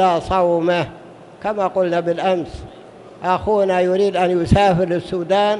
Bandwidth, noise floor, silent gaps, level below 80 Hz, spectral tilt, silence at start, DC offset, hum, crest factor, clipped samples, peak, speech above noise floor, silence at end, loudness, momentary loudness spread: 11.5 kHz; -40 dBFS; none; -38 dBFS; -6.5 dB/octave; 0 s; under 0.1%; none; 16 dB; under 0.1%; 0 dBFS; 23 dB; 0 s; -18 LUFS; 12 LU